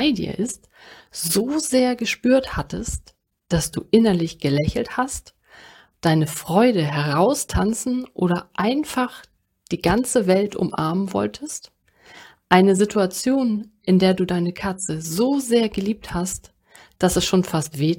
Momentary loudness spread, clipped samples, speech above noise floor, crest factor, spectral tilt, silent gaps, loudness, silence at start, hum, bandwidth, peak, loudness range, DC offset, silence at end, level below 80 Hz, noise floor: 10 LU; under 0.1%; 28 dB; 20 dB; -5 dB/octave; none; -21 LUFS; 0 s; none; 17 kHz; 0 dBFS; 3 LU; under 0.1%; 0 s; -42 dBFS; -48 dBFS